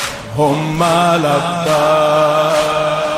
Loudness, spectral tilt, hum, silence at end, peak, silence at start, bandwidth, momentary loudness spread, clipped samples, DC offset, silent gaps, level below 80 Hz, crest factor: -14 LUFS; -5 dB/octave; none; 0 s; -2 dBFS; 0 s; 16 kHz; 4 LU; under 0.1%; under 0.1%; none; -44 dBFS; 10 dB